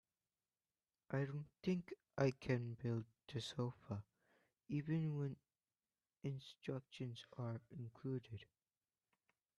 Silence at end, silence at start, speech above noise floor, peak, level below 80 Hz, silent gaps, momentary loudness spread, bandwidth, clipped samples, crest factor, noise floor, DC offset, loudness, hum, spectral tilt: 1.15 s; 1.1 s; over 45 dB; -26 dBFS; -78 dBFS; none; 10 LU; 11 kHz; under 0.1%; 22 dB; under -90 dBFS; under 0.1%; -46 LUFS; none; -7.5 dB/octave